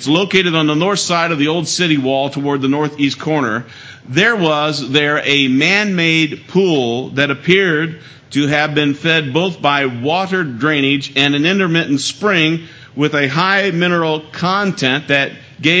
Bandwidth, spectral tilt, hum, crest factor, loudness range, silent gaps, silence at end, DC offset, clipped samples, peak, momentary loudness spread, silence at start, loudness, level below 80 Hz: 8 kHz; -4.5 dB/octave; none; 14 dB; 2 LU; none; 0 s; under 0.1%; under 0.1%; 0 dBFS; 6 LU; 0 s; -14 LUFS; -58 dBFS